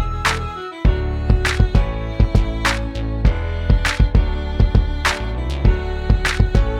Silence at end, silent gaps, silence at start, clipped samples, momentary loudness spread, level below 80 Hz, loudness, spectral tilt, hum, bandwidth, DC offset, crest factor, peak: 0 s; none; 0 s; under 0.1%; 6 LU; -18 dBFS; -19 LUFS; -5.5 dB/octave; none; 12 kHz; under 0.1%; 16 dB; 0 dBFS